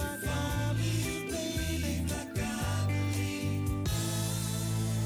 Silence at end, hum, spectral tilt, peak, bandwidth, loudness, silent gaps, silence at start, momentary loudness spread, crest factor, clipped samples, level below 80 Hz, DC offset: 0 s; none; -5 dB/octave; -20 dBFS; over 20 kHz; -32 LUFS; none; 0 s; 3 LU; 10 dB; under 0.1%; -42 dBFS; under 0.1%